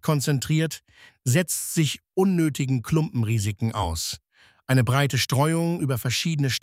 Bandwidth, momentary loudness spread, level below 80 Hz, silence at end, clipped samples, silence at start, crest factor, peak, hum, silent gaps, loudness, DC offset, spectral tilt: 16 kHz; 7 LU; -48 dBFS; 0.05 s; under 0.1%; 0.05 s; 16 dB; -8 dBFS; none; none; -24 LUFS; under 0.1%; -5 dB/octave